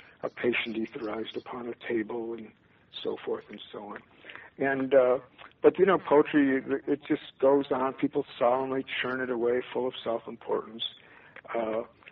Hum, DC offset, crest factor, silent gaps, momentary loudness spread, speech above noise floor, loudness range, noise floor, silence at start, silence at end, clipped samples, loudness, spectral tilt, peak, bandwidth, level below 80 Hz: none; under 0.1%; 22 dB; none; 17 LU; 21 dB; 10 LU; -49 dBFS; 0.25 s; 0.25 s; under 0.1%; -29 LUFS; -3.5 dB/octave; -8 dBFS; 5.6 kHz; -70 dBFS